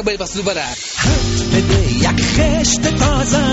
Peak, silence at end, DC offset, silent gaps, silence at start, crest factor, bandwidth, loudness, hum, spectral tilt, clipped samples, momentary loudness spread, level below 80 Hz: -2 dBFS; 0 s; under 0.1%; none; 0 s; 12 dB; 8.2 kHz; -15 LUFS; none; -4 dB/octave; under 0.1%; 6 LU; -22 dBFS